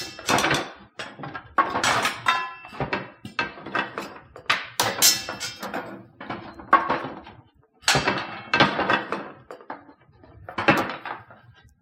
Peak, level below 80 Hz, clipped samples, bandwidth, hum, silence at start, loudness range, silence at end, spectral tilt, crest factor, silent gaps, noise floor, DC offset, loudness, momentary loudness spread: -2 dBFS; -56 dBFS; under 0.1%; 16 kHz; none; 0 s; 2 LU; 0.3 s; -2 dB/octave; 24 dB; none; -54 dBFS; under 0.1%; -23 LUFS; 19 LU